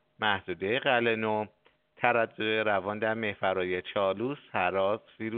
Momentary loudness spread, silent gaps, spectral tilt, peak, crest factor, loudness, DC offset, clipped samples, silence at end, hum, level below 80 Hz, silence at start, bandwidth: 6 LU; none; -2.5 dB/octave; -6 dBFS; 22 dB; -29 LUFS; under 0.1%; under 0.1%; 0 s; none; -72 dBFS; 0.2 s; 4.6 kHz